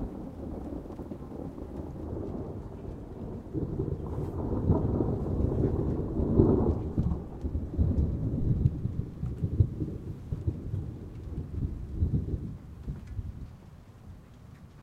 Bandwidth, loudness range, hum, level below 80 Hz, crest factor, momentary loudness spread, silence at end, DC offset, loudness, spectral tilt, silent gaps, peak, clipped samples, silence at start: 4.9 kHz; 9 LU; none; -38 dBFS; 26 dB; 14 LU; 0 s; under 0.1%; -32 LUFS; -11 dB/octave; none; -6 dBFS; under 0.1%; 0 s